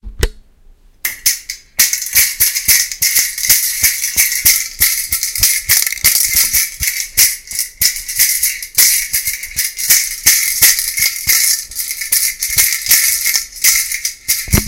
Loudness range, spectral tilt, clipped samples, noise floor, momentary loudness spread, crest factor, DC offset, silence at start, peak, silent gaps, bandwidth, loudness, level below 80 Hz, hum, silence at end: 2 LU; 0.5 dB/octave; 0.3%; -44 dBFS; 8 LU; 14 dB; under 0.1%; 0.05 s; 0 dBFS; none; over 20 kHz; -11 LUFS; -32 dBFS; none; 0 s